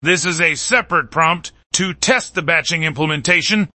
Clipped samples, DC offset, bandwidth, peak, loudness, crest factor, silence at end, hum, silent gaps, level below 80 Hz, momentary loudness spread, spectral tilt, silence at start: under 0.1%; under 0.1%; 8.8 kHz; 0 dBFS; -16 LUFS; 18 dB; 0.1 s; none; 1.66-1.70 s; -50 dBFS; 5 LU; -3 dB/octave; 0 s